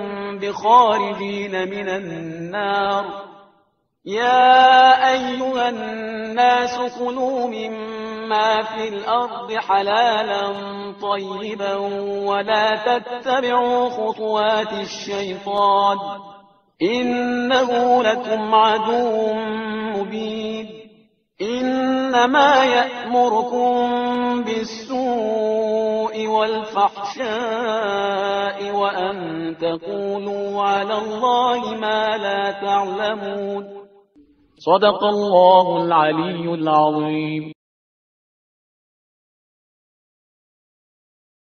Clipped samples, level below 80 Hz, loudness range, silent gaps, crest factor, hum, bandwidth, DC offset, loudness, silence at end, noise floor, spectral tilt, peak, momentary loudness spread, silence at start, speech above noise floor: under 0.1%; -62 dBFS; 6 LU; none; 20 dB; none; 6.6 kHz; under 0.1%; -19 LUFS; 4 s; -63 dBFS; -2 dB/octave; 0 dBFS; 12 LU; 0 s; 44 dB